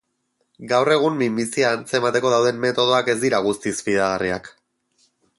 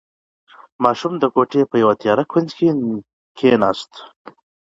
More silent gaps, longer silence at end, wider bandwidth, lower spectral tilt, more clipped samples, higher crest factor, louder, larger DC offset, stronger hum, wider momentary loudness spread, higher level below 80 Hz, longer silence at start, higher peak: second, none vs 3.13-3.35 s; first, 0.9 s vs 0.6 s; first, 11.5 kHz vs 7.8 kHz; second, -4 dB/octave vs -7 dB/octave; neither; about the same, 16 dB vs 18 dB; second, -20 LUFS vs -17 LUFS; neither; neither; second, 5 LU vs 12 LU; about the same, -58 dBFS vs -60 dBFS; second, 0.6 s vs 0.8 s; second, -4 dBFS vs 0 dBFS